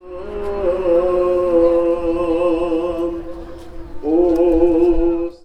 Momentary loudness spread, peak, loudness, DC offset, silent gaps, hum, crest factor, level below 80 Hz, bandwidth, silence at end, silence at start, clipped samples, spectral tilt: 15 LU; -2 dBFS; -17 LUFS; under 0.1%; none; none; 14 dB; -32 dBFS; 8.6 kHz; 0.1 s; 0.05 s; under 0.1%; -8 dB/octave